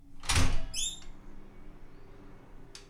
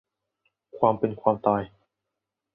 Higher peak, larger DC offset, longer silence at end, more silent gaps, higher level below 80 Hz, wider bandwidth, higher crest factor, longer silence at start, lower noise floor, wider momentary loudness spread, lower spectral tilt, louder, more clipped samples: second, -14 dBFS vs -4 dBFS; neither; second, 0.05 s vs 0.85 s; neither; first, -36 dBFS vs -62 dBFS; first, 15 kHz vs 3.9 kHz; second, 18 dB vs 24 dB; second, 0.1 s vs 0.75 s; second, -49 dBFS vs -85 dBFS; first, 26 LU vs 5 LU; second, -2.5 dB/octave vs -11.5 dB/octave; second, -32 LUFS vs -25 LUFS; neither